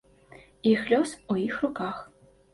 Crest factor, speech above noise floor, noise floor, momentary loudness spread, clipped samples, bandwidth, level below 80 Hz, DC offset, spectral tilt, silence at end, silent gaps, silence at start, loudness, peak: 18 dB; 27 dB; -53 dBFS; 11 LU; under 0.1%; 11.5 kHz; -62 dBFS; under 0.1%; -5.5 dB/octave; 0.5 s; none; 0.3 s; -27 LUFS; -10 dBFS